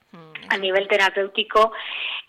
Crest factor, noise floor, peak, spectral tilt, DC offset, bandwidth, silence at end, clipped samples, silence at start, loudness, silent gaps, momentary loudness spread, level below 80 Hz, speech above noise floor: 16 dB; -41 dBFS; -6 dBFS; -2.5 dB/octave; under 0.1%; 16 kHz; 0.1 s; under 0.1%; 0.15 s; -20 LUFS; none; 11 LU; -58 dBFS; 21 dB